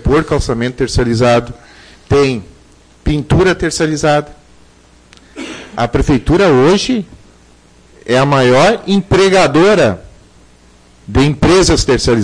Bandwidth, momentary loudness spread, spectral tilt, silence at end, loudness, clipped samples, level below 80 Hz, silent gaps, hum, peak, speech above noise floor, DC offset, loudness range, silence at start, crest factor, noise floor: 10.5 kHz; 15 LU; -5.5 dB/octave; 0 s; -12 LUFS; under 0.1%; -28 dBFS; none; none; -2 dBFS; 34 dB; under 0.1%; 4 LU; 0.05 s; 10 dB; -44 dBFS